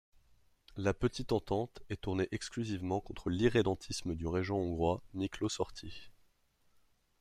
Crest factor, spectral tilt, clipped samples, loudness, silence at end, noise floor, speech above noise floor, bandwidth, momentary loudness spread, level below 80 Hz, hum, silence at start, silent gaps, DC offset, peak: 22 dB; -6 dB/octave; under 0.1%; -36 LUFS; 1.1 s; -73 dBFS; 38 dB; 13.5 kHz; 9 LU; -54 dBFS; none; 0.75 s; none; under 0.1%; -14 dBFS